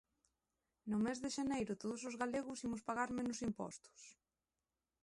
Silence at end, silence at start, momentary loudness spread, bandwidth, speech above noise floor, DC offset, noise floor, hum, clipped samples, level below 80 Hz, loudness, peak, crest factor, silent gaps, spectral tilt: 0.9 s; 0.85 s; 15 LU; 11.5 kHz; over 48 dB; under 0.1%; under -90 dBFS; none; under 0.1%; -72 dBFS; -42 LUFS; -26 dBFS; 18 dB; none; -4.5 dB/octave